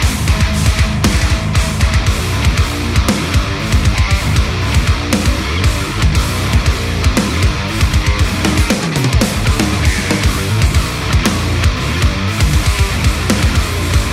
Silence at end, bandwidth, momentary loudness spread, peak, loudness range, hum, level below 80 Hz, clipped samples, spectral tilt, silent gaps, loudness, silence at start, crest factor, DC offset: 0 s; 16 kHz; 2 LU; 0 dBFS; 1 LU; none; -18 dBFS; under 0.1%; -4.5 dB/octave; none; -14 LUFS; 0 s; 12 dB; under 0.1%